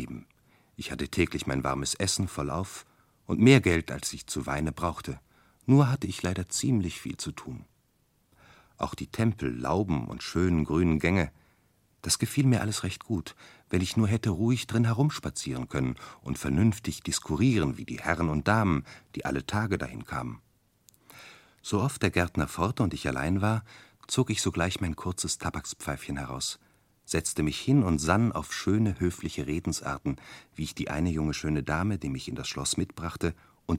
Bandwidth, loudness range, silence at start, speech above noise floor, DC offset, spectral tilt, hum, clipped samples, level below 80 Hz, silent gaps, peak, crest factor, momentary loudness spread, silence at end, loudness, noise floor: 16.5 kHz; 5 LU; 0 s; 41 dB; under 0.1%; -5 dB/octave; none; under 0.1%; -46 dBFS; none; -4 dBFS; 24 dB; 12 LU; 0 s; -29 LUFS; -69 dBFS